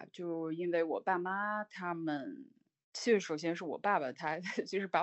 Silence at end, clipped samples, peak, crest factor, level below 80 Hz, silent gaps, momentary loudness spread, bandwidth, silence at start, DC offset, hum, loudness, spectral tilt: 0 s; under 0.1%; -16 dBFS; 20 dB; -88 dBFS; 2.84-2.92 s; 9 LU; 8.2 kHz; 0 s; under 0.1%; none; -36 LUFS; -5 dB/octave